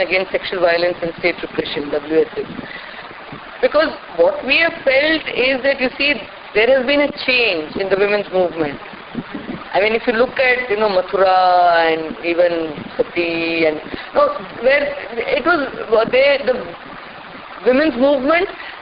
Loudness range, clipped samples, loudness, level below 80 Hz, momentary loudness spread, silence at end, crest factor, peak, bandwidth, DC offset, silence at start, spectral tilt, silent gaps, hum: 4 LU; under 0.1%; -16 LUFS; -48 dBFS; 15 LU; 0 s; 14 dB; -2 dBFS; 5.4 kHz; under 0.1%; 0 s; -1.5 dB/octave; none; none